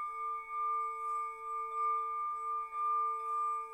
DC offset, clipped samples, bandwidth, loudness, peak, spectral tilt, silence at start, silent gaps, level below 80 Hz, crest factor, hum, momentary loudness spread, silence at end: under 0.1%; under 0.1%; 12 kHz; -36 LUFS; -28 dBFS; -1.5 dB/octave; 0 s; none; -76 dBFS; 10 dB; none; 5 LU; 0 s